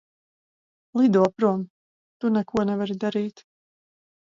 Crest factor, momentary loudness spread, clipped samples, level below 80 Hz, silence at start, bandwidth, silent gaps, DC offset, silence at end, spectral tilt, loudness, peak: 18 dB; 11 LU; under 0.1%; -64 dBFS; 0.95 s; 7.6 kHz; 1.70-2.20 s; under 0.1%; 0.95 s; -8 dB/octave; -24 LUFS; -6 dBFS